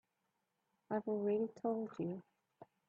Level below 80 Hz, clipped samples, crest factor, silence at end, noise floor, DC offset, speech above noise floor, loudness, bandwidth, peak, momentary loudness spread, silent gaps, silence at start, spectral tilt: -86 dBFS; under 0.1%; 16 dB; 0.25 s; -86 dBFS; under 0.1%; 47 dB; -40 LUFS; 7.2 kHz; -26 dBFS; 7 LU; none; 0.9 s; -9.5 dB/octave